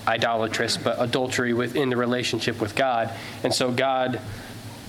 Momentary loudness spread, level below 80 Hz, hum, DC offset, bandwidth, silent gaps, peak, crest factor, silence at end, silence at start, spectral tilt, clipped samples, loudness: 7 LU; -56 dBFS; none; under 0.1%; 17.5 kHz; none; -6 dBFS; 18 dB; 0 s; 0 s; -4 dB/octave; under 0.1%; -24 LUFS